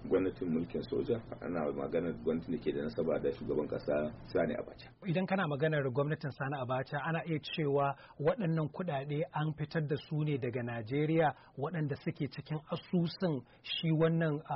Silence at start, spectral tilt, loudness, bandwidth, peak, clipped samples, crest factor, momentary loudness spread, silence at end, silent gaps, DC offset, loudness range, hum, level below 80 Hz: 0 s; -6 dB/octave; -35 LUFS; 5.8 kHz; -20 dBFS; under 0.1%; 14 dB; 7 LU; 0 s; none; under 0.1%; 1 LU; none; -62 dBFS